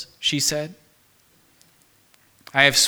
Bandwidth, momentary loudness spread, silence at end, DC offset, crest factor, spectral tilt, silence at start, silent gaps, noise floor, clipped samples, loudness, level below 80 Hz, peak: over 20 kHz; 14 LU; 0 s; under 0.1%; 24 dB; -1.5 dB/octave; 0 s; none; -59 dBFS; under 0.1%; -20 LUFS; -60 dBFS; -2 dBFS